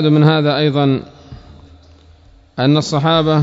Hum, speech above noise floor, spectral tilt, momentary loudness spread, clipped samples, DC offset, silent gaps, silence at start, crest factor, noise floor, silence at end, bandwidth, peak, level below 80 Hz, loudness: none; 33 dB; -7 dB/octave; 11 LU; under 0.1%; under 0.1%; none; 0 s; 16 dB; -46 dBFS; 0 s; 7.8 kHz; 0 dBFS; -46 dBFS; -14 LUFS